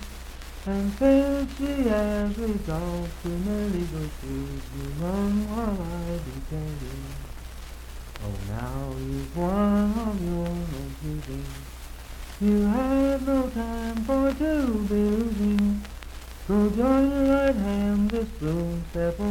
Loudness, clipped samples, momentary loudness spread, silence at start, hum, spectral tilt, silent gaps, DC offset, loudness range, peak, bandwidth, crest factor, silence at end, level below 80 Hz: -26 LUFS; under 0.1%; 18 LU; 0 s; none; -7 dB/octave; none; under 0.1%; 7 LU; -10 dBFS; 17 kHz; 16 dB; 0 s; -36 dBFS